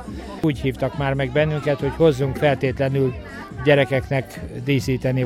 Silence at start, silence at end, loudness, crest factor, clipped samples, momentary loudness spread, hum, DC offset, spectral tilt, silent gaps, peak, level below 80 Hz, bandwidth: 0 s; 0 s; -21 LUFS; 18 dB; under 0.1%; 8 LU; none; under 0.1%; -7 dB/octave; none; -2 dBFS; -40 dBFS; 14.5 kHz